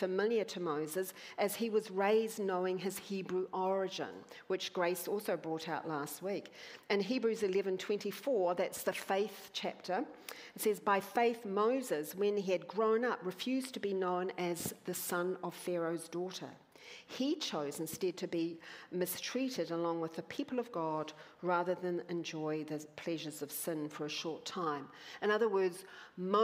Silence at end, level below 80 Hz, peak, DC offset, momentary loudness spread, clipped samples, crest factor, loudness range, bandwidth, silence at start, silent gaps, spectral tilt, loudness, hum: 0 s; -84 dBFS; -18 dBFS; under 0.1%; 9 LU; under 0.1%; 20 dB; 4 LU; 16 kHz; 0 s; none; -4.5 dB/octave; -37 LUFS; none